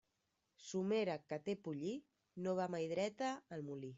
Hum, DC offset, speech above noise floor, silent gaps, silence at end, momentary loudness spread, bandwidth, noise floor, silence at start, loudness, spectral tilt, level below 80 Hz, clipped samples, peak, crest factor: none; under 0.1%; 44 dB; none; 0 s; 9 LU; 8 kHz; -86 dBFS; 0.6 s; -43 LUFS; -6 dB/octave; -84 dBFS; under 0.1%; -28 dBFS; 16 dB